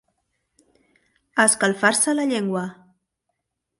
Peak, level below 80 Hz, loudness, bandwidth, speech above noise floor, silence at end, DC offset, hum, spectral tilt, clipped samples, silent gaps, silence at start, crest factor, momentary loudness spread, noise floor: -4 dBFS; -70 dBFS; -20 LUFS; 12 kHz; 58 dB; 1.05 s; under 0.1%; none; -2.5 dB/octave; under 0.1%; none; 1.35 s; 22 dB; 11 LU; -78 dBFS